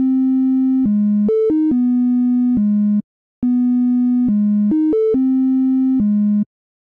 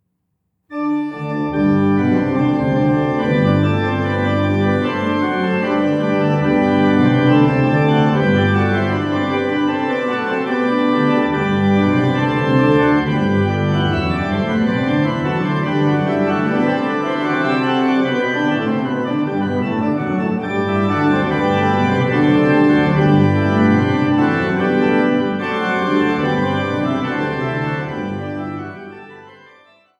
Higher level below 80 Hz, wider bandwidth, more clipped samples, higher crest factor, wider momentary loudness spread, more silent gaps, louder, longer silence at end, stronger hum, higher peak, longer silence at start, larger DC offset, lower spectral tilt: second, -52 dBFS vs -46 dBFS; second, 2.3 kHz vs 7.6 kHz; neither; second, 6 dB vs 14 dB; second, 2 LU vs 6 LU; first, 3.04-3.42 s vs none; about the same, -16 LUFS vs -16 LUFS; second, 0.45 s vs 0.7 s; neither; second, -10 dBFS vs -2 dBFS; second, 0 s vs 0.7 s; neither; first, -12.5 dB/octave vs -8 dB/octave